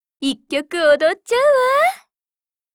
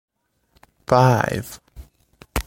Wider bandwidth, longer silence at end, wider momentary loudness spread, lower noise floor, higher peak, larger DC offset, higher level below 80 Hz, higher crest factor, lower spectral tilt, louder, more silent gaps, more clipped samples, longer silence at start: about the same, 17.5 kHz vs 17 kHz; first, 0.8 s vs 0.05 s; second, 10 LU vs 23 LU; first, under -90 dBFS vs -63 dBFS; about the same, -4 dBFS vs -2 dBFS; neither; second, -62 dBFS vs -40 dBFS; second, 14 dB vs 22 dB; second, -2 dB/octave vs -6 dB/octave; about the same, -17 LUFS vs -19 LUFS; neither; neither; second, 0.2 s vs 0.9 s